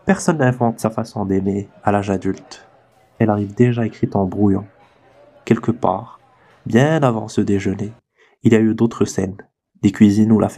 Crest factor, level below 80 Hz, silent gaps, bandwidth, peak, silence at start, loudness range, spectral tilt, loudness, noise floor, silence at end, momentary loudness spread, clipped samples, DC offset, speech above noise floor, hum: 18 dB; -54 dBFS; none; 12.5 kHz; 0 dBFS; 0.05 s; 2 LU; -7 dB/octave; -18 LUFS; -53 dBFS; 0 s; 11 LU; under 0.1%; under 0.1%; 36 dB; none